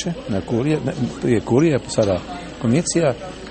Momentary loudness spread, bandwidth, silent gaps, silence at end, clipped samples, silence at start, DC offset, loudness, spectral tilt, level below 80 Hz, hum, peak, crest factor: 8 LU; 8.8 kHz; none; 0 s; under 0.1%; 0 s; under 0.1%; -20 LUFS; -6 dB/octave; -44 dBFS; none; -4 dBFS; 16 dB